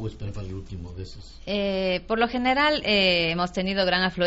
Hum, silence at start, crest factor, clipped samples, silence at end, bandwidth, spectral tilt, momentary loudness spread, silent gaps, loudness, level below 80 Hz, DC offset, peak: none; 0 s; 18 dB; under 0.1%; 0 s; 8 kHz; -2.5 dB/octave; 18 LU; none; -23 LUFS; -44 dBFS; under 0.1%; -8 dBFS